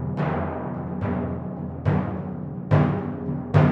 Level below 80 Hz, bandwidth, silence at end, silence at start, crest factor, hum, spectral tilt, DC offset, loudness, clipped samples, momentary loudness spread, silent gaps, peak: -46 dBFS; 5.2 kHz; 0 s; 0 s; 20 dB; none; -10 dB/octave; under 0.1%; -26 LUFS; under 0.1%; 10 LU; none; -4 dBFS